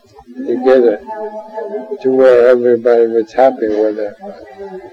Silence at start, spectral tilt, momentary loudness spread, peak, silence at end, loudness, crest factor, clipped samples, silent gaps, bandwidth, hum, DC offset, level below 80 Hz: 0.3 s; -7 dB/octave; 20 LU; 0 dBFS; 0.05 s; -12 LUFS; 12 dB; under 0.1%; none; 6.8 kHz; none; under 0.1%; -56 dBFS